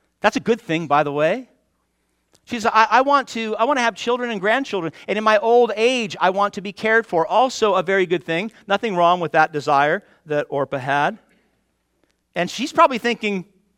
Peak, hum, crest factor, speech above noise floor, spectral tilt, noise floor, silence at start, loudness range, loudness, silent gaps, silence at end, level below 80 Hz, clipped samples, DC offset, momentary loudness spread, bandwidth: 0 dBFS; none; 20 dB; 50 dB; -4.5 dB/octave; -69 dBFS; 0.25 s; 4 LU; -19 LUFS; none; 0.35 s; -64 dBFS; under 0.1%; under 0.1%; 9 LU; 13.5 kHz